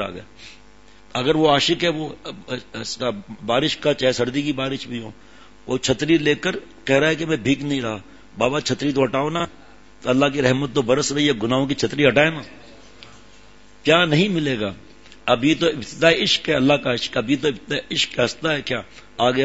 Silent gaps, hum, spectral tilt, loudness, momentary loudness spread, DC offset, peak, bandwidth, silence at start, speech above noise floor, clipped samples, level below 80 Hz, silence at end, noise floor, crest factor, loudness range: none; none; -4.5 dB/octave; -20 LUFS; 13 LU; 0.5%; 0 dBFS; 8 kHz; 0 s; 29 dB; under 0.1%; -50 dBFS; 0 s; -50 dBFS; 22 dB; 3 LU